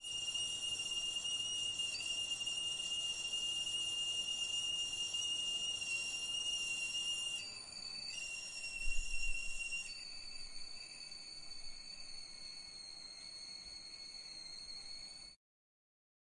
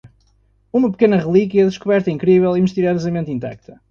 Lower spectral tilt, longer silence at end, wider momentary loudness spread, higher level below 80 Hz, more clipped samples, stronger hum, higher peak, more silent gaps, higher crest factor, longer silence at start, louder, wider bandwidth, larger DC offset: second, 1.5 dB/octave vs -8 dB/octave; first, 1 s vs 0.35 s; first, 12 LU vs 9 LU; about the same, -54 dBFS vs -52 dBFS; neither; neither; second, -24 dBFS vs -2 dBFS; neither; about the same, 18 dB vs 16 dB; about the same, 0 s vs 0.05 s; second, -40 LUFS vs -16 LUFS; first, 11.5 kHz vs 7 kHz; neither